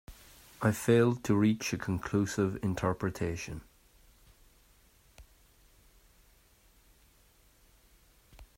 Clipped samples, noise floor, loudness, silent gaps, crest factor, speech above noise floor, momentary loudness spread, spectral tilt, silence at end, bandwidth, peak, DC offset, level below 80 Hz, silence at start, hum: under 0.1%; -64 dBFS; -31 LUFS; none; 22 dB; 34 dB; 19 LU; -6 dB/octave; 0.15 s; 16 kHz; -12 dBFS; under 0.1%; -58 dBFS; 0.1 s; none